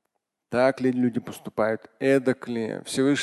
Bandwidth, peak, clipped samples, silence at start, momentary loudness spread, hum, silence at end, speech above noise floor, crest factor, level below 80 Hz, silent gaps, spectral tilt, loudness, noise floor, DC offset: 12.5 kHz; -8 dBFS; under 0.1%; 0.5 s; 8 LU; none; 0 s; 55 dB; 16 dB; -64 dBFS; none; -5.5 dB/octave; -25 LUFS; -79 dBFS; under 0.1%